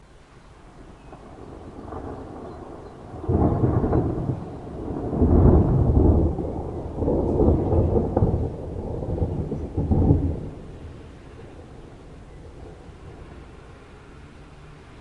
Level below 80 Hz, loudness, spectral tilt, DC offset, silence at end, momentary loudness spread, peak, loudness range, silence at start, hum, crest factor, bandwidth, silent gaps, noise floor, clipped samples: -32 dBFS; -23 LUFS; -11 dB/octave; under 0.1%; 0 s; 25 LU; -2 dBFS; 22 LU; 0.5 s; none; 22 dB; 4.7 kHz; none; -48 dBFS; under 0.1%